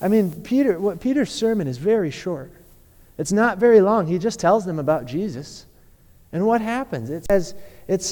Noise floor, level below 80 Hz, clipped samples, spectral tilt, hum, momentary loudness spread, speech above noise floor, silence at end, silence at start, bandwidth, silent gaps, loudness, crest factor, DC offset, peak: -51 dBFS; -48 dBFS; under 0.1%; -6 dB/octave; none; 15 LU; 31 dB; 0 s; 0 s; 19 kHz; none; -21 LUFS; 16 dB; under 0.1%; -4 dBFS